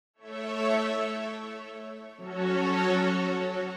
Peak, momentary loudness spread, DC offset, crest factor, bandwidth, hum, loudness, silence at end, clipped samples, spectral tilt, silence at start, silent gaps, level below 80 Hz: -14 dBFS; 16 LU; under 0.1%; 16 dB; 10.5 kHz; none; -29 LUFS; 0 s; under 0.1%; -6 dB/octave; 0.2 s; none; -76 dBFS